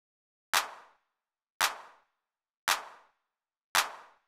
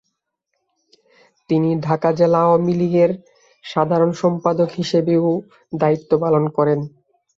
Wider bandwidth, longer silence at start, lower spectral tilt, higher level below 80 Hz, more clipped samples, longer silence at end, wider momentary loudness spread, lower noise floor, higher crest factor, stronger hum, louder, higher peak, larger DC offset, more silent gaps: first, over 20 kHz vs 7.6 kHz; second, 0.55 s vs 1.5 s; second, 2 dB/octave vs -8 dB/octave; second, -78 dBFS vs -60 dBFS; neither; second, 0.25 s vs 0.5 s; first, 13 LU vs 9 LU; first, -87 dBFS vs -75 dBFS; first, 24 dB vs 16 dB; neither; second, -31 LUFS vs -18 LUFS; second, -12 dBFS vs -2 dBFS; neither; first, 1.50-1.60 s, 2.57-2.67 s, 3.64-3.75 s vs none